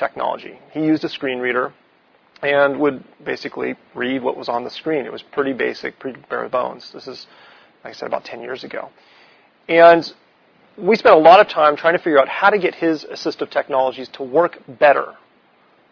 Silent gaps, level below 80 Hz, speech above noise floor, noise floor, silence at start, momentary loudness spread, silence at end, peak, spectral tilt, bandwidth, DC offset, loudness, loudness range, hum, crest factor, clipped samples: none; -64 dBFS; 38 dB; -55 dBFS; 0 s; 20 LU; 0.8 s; 0 dBFS; -6 dB/octave; 5.4 kHz; under 0.1%; -17 LUFS; 12 LU; none; 18 dB; under 0.1%